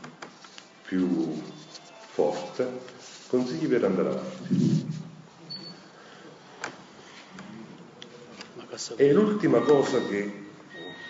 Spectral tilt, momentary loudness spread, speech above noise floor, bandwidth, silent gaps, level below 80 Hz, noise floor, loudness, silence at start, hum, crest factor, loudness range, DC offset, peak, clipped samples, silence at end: -6.5 dB/octave; 24 LU; 24 dB; 7.8 kHz; none; -74 dBFS; -49 dBFS; -26 LUFS; 0 s; none; 20 dB; 17 LU; under 0.1%; -8 dBFS; under 0.1%; 0 s